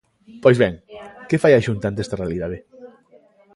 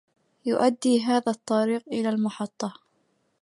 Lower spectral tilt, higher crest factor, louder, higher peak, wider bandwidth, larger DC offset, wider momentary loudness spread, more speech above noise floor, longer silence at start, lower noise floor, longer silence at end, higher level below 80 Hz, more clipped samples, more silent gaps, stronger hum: first, -7 dB/octave vs -5 dB/octave; about the same, 20 dB vs 18 dB; first, -19 LUFS vs -26 LUFS; first, 0 dBFS vs -8 dBFS; about the same, 11.5 kHz vs 11.5 kHz; neither; first, 21 LU vs 11 LU; second, 35 dB vs 46 dB; about the same, 0.35 s vs 0.45 s; second, -53 dBFS vs -70 dBFS; about the same, 0.7 s vs 0.7 s; first, -46 dBFS vs -76 dBFS; neither; neither; neither